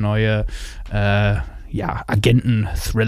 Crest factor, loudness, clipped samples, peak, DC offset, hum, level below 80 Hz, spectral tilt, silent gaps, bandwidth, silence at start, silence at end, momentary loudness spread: 18 dB; -20 LUFS; under 0.1%; -2 dBFS; under 0.1%; none; -30 dBFS; -6.5 dB/octave; none; 15 kHz; 0 s; 0 s; 11 LU